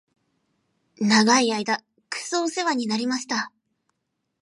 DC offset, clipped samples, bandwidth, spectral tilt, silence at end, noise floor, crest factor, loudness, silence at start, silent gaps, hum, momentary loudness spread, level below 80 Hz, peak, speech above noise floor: under 0.1%; under 0.1%; 11.5 kHz; -3 dB/octave; 0.95 s; -78 dBFS; 20 dB; -23 LUFS; 1 s; none; none; 12 LU; -76 dBFS; -6 dBFS; 56 dB